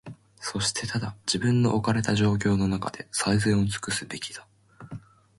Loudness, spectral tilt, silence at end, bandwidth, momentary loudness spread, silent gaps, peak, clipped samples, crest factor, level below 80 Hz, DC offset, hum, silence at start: -26 LUFS; -5 dB/octave; 0.4 s; 11.5 kHz; 20 LU; none; -10 dBFS; under 0.1%; 16 dB; -50 dBFS; under 0.1%; none; 0.05 s